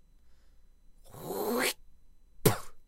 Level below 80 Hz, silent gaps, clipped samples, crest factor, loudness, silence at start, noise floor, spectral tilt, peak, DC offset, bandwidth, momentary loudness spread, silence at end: -52 dBFS; none; under 0.1%; 28 dB; -32 LUFS; 0.25 s; -57 dBFS; -4 dB/octave; -6 dBFS; under 0.1%; 16 kHz; 16 LU; 0.05 s